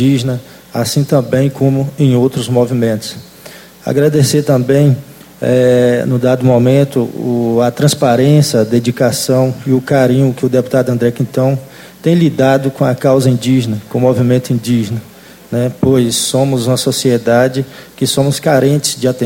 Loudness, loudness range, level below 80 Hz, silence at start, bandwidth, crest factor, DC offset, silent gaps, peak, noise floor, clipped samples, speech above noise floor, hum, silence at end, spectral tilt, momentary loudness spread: -12 LUFS; 2 LU; -48 dBFS; 0 s; 17 kHz; 12 dB; under 0.1%; none; 0 dBFS; -35 dBFS; under 0.1%; 24 dB; none; 0 s; -6 dB/octave; 8 LU